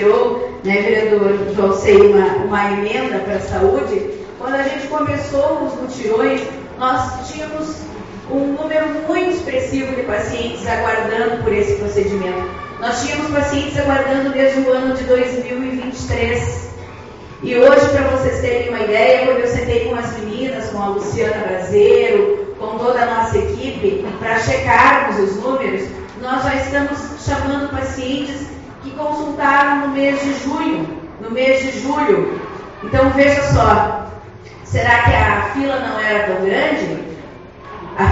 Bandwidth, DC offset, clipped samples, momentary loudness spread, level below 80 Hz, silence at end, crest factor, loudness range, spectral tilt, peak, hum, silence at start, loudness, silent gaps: 8 kHz; under 0.1%; under 0.1%; 14 LU; -38 dBFS; 0 s; 16 dB; 5 LU; -4.5 dB/octave; 0 dBFS; none; 0 s; -16 LUFS; none